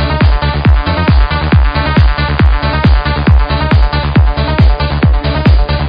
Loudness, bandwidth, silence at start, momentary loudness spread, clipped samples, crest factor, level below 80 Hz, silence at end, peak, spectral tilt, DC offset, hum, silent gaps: -11 LUFS; 5.2 kHz; 0 s; 1 LU; 0.2%; 8 dB; -12 dBFS; 0 s; 0 dBFS; -9.5 dB/octave; under 0.1%; none; none